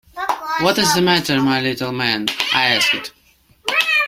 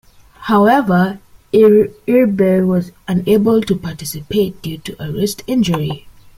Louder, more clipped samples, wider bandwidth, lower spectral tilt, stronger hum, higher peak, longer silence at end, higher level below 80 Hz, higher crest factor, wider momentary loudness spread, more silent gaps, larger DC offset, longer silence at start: about the same, -17 LUFS vs -15 LUFS; neither; about the same, 16.5 kHz vs 16 kHz; second, -3 dB/octave vs -6.5 dB/octave; neither; about the same, 0 dBFS vs 0 dBFS; second, 0 s vs 0.4 s; second, -54 dBFS vs -46 dBFS; about the same, 18 dB vs 14 dB; second, 9 LU vs 15 LU; neither; neither; second, 0.15 s vs 0.4 s